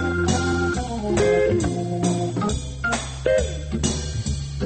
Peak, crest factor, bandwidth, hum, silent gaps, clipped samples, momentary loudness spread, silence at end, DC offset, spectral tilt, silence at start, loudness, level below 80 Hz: -6 dBFS; 16 dB; 8.8 kHz; none; none; under 0.1%; 7 LU; 0 s; under 0.1%; -5.5 dB/octave; 0 s; -23 LUFS; -32 dBFS